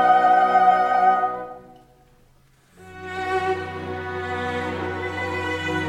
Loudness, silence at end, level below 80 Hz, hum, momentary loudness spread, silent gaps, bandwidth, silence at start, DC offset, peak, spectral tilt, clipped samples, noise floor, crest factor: -21 LUFS; 0 s; -56 dBFS; none; 15 LU; none; 11 kHz; 0 s; under 0.1%; -6 dBFS; -5.5 dB/octave; under 0.1%; -56 dBFS; 16 dB